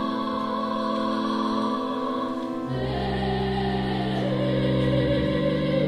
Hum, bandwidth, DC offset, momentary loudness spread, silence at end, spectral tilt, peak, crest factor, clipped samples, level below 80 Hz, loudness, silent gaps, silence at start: none; 11 kHz; under 0.1%; 5 LU; 0 s; -7.5 dB/octave; -10 dBFS; 14 dB; under 0.1%; -42 dBFS; -26 LUFS; none; 0 s